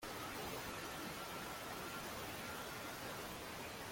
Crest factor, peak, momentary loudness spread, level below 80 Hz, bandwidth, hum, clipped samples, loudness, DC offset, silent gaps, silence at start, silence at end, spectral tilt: 14 dB; -34 dBFS; 2 LU; -66 dBFS; 16.5 kHz; none; under 0.1%; -46 LUFS; under 0.1%; none; 0 s; 0 s; -3 dB/octave